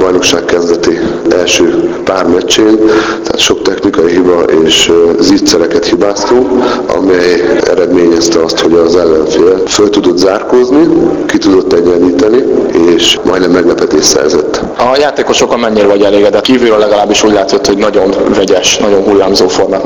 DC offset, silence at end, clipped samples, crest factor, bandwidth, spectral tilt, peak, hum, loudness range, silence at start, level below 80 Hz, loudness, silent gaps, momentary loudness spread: under 0.1%; 0 s; 2%; 6 dB; 19 kHz; -3.5 dB/octave; 0 dBFS; none; 1 LU; 0 s; -36 dBFS; -7 LUFS; none; 4 LU